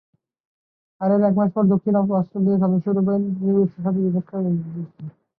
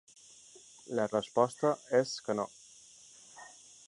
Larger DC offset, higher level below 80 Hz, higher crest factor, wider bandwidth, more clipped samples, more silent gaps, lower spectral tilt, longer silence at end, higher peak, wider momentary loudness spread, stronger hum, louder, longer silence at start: neither; first, -64 dBFS vs -78 dBFS; second, 14 dB vs 22 dB; second, 2 kHz vs 11.5 kHz; neither; neither; first, -14 dB/octave vs -4.5 dB/octave; about the same, 0.3 s vs 0.4 s; first, -6 dBFS vs -12 dBFS; second, 8 LU vs 24 LU; neither; first, -20 LUFS vs -32 LUFS; about the same, 1 s vs 0.9 s